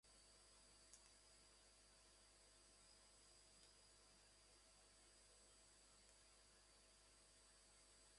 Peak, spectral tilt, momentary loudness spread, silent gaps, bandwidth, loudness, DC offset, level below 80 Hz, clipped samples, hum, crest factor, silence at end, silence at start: -44 dBFS; -1 dB/octave; 2 LU; none; 11.5 kHz; -69 LUFS; under 0.1%; -80 dBFS; under 0.1%; 50 Hz at -80 dBFS; 26 dB; 0 s; 0.05 s